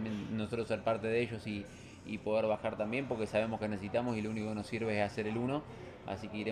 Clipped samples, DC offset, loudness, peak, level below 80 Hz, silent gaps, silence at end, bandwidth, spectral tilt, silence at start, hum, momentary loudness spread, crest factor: under 0.1%; under 0.1%; -36 LUFS; -20 dBFS; -64 dBFS; none; 0 s; 11.5 kHz; -6.5 dB/octave; 0 s; none; 10 LU; 16 dB